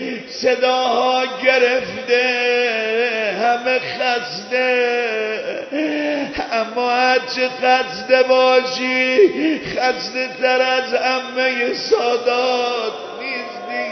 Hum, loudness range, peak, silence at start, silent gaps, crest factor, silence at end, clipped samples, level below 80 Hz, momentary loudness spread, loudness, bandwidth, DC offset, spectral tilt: none; 3 LU; 0 dBFS; 0 s; none; 18 dB; 0 s; under 0.1%; -58 dBFS; 9 LU; -17 LUFS; 6.4 kHz; under 0.1%; -3 dB/octave